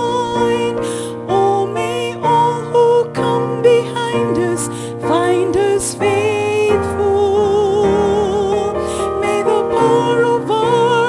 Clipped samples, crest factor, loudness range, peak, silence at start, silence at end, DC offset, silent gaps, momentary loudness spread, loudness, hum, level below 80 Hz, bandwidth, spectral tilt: under 0.1%; 14 dB; 1 LU; 0 dBFS; 0 s; 0 s; under 0.1%; none; 6 LU; -15 LUFS; none; -44 dBFS; 12 kHz; -5 dB/octave